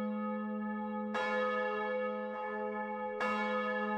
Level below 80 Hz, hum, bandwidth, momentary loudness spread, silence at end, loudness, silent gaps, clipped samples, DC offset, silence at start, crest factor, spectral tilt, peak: -78 dBFS; none; 8.8 kHz; 5 LU; 0 s; -36 LUFS; none; under 0.1%; under 0.1%; 0 s; 14 dB; -6.5 dB/octave; -22 dBFS